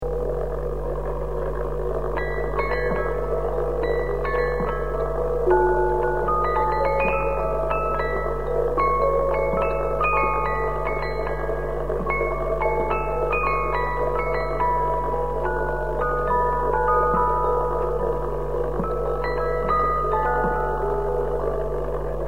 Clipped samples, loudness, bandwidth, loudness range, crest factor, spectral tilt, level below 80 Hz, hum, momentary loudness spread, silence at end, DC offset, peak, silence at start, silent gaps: under 0.1%; -23 LUFS; 12 kHz; 3 LU; 16 dB; -8 dB/octave; -32 dBFS; 50 Hz at -30 dBFS; 6 LU; 0 s; 2%; -6 dBFS; 0 s; none